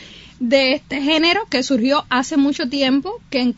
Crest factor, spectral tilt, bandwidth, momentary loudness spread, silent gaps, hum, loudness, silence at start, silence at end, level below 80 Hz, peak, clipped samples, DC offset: 16 dB; -3.5 dB/octave; 8 kHz; 5 LU; none; none; -17 LUFS; 0 s; 0.05 s; -52 dBFS; -2 dBFS; under 0.1%; under 0.1%